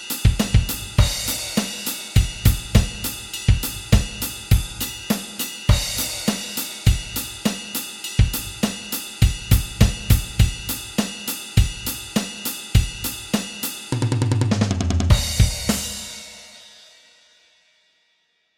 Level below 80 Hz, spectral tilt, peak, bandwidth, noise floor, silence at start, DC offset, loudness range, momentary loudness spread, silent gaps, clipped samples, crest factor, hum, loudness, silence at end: -26 dBFS; -4.5 dB/octave; 0 dBFS; 17 kHz; -66 dBFS; 0 s; under 0.1%; 2 LU; 9 LU; none; under 0.1%; 20 dB; none; -22 LUFS; 1.9 s